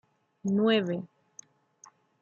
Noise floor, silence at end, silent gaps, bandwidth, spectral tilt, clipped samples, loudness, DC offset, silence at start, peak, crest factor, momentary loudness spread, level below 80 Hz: -59 dBFS; 1.15 s; none; 7.2 kHz; -6 dB/octave; under 0.1%; -28 LUFS; under 0.1%; 0.45 s; -12 dBFS; 20 dB; 14 LU; -76 dBFS